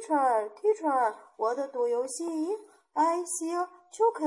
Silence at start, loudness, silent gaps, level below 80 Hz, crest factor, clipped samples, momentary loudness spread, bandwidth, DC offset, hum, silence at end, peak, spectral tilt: 0 s; -29 LUFS; none; under -90 dBFS; 14 dB; under 0.1%; 7 LU; 12 kHz; under 0.1%; none; 0 s; -14 dBFS; -2 dB/octave